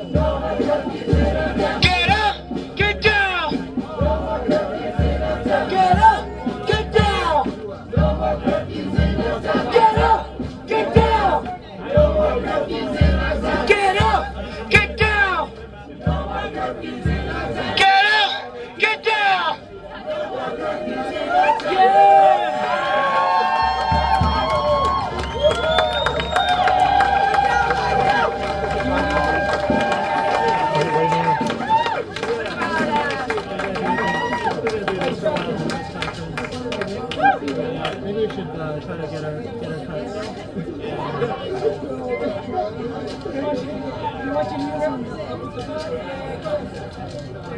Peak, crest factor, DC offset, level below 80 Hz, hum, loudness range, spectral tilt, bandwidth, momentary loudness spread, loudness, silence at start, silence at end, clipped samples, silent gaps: 0 dBFS; 20 dB; under 0.1%; -32 dBFS; none; 8 LU; -5.5 dB/octave; 10.5 kHz; 12 LU; -19 LUFS; 0 s; 0 s; under 0.1%; none